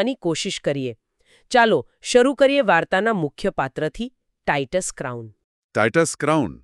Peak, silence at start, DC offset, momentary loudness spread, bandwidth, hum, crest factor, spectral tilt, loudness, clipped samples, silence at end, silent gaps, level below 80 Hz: -4 dBFS; 0 s; under 0.1%; 13 LU; 12.5 kHz; none; 18 dB; -4.5 dB/octave; -21 LUFS; under 0.1%; 0.1 s; 5.44-5.69 s; -50 dBFS